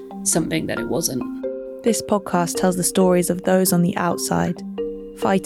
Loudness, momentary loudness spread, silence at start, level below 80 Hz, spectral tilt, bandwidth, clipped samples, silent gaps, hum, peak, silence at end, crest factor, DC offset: -21 LUFS; 11 LU; 0 s; -50 dBFS; -4.5 dB/octave; 16.5 kHz; under 0.1%; none; none; -6 dBFS; 0 s; 14 dB; under 0.1%